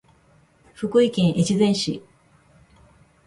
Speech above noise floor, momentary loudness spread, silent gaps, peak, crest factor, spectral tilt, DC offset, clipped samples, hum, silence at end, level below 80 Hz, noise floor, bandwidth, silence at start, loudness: 38 dB; 11 LU; none; -6 dBFS; 16 dB; -6 dB/octave; under 0.1%; under 0.1%; none; 1.25 s; -56 dBFS; -57 dBFS; 11.5 kHz; 0.8 s; -21 LUFS